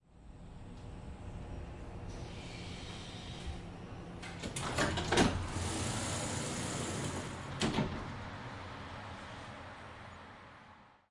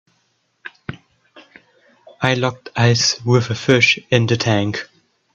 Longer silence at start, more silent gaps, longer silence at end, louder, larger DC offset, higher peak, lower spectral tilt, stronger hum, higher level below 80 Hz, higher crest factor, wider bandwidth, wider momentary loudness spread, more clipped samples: second, 0.1 s vs 0.65 s; neither; second, 0.15 s vs 0.5 s; second, -39 LUFS vs -16 LUFS; neither; second, -14 dBFS vs 0 dBFS; about the same, -4 dB/octave vs -4.5 dB/octave; neither; about the same, -52 dBFS vs -54 dBFS; first, 26 dB vs 18 dB; first, 11.5 kHz vs 7.6 kHz; second, 17 LU vs 21 LU; neither